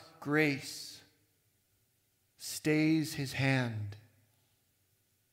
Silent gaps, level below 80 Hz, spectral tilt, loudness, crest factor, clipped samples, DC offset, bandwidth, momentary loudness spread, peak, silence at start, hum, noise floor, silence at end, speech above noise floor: none; -74 dBFS; -5.5 dB/octave; -32 LUFS; 20 dB; under 0.1%; under 0.1%; 16 kHz; 15 LU; -16 dBFS; 0 s; none; -75 dBFS; 1.35 s; 43 dB